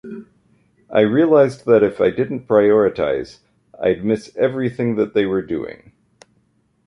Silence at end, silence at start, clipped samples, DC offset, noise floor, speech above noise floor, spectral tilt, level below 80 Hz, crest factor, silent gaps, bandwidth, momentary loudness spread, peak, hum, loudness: 1.15 s; 0.05 s; under 0.1%; under 0.1%; -62 dBFS; 45 dB; -7.5 dB/octave; -52 dBFS; 16 dB; none; 10.5 kHz; 13 LU; -2 dBFS; none; -17 LUFS